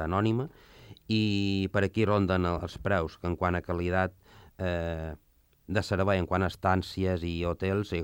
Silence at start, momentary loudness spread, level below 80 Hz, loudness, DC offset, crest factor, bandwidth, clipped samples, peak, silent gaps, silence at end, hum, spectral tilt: 0 s; 7 LU; -52 dBFS; -29 LUFS; under 0.1%; 18 dB; 16.5 kHz; under 0.1%; -12 dBFS; none; 0 s; none; -7 dB/octave